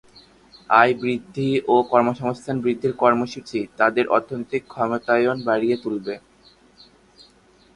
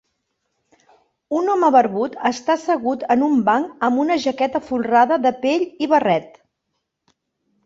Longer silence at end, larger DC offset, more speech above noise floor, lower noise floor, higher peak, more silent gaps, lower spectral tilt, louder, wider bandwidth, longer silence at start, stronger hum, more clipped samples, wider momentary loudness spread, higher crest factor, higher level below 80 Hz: first, 1.6 s vs 1.4 s; neither; second, 34 dB vs 58 dB; second, -55 dBFS vs -76 dBFS; about the same, 0 dBFS vs -2 dBFS; neither; about the same, -6.5 dB/octave vs -5.5 dB/octave; second, -21 LUFS vs -18 LUFS; first, 10.5 kHz vs 7.8 kHz; second, 0.7 s vs 1.3 s; neither; neither; first, 11 LU vs 7 LU; about the same, 22 dB vs 18 dB; about the same, -62 dBFS vs -64 dBFS